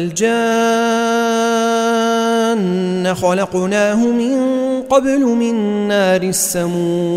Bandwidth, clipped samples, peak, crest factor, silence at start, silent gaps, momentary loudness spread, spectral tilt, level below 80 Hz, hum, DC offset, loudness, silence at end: 16 kHz; under 0.1%; -2 dBFS; 14 dB; 0 s; none; 3 LU; -4.5 dB/octave; -54 dBFS; none; under 0.1%; -15 LUFS; 0 s